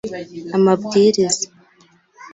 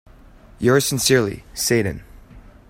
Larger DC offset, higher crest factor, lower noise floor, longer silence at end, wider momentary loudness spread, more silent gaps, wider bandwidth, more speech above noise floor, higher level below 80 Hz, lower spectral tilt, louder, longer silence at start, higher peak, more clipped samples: neither; about the same, 16 dB vs 18 dB; first, -54 dBFS vs -46 dBFS; second, 0.05 s vs 0.3 s; first, 15 LU vs 10 LU; neither; second, 8 kHz vs 16.5 kHz; first, 38 dB vs 27 dB; second, -60 dBFS vs -44 dBFS; about the same, -4.5 dB/octave vs -4 dB/octave; about the same, -17 LUFS vs -19 LUFS; second, 0.05 s vs 0.6 s; about the same, -4 dBFS vs -2 dBFS; neither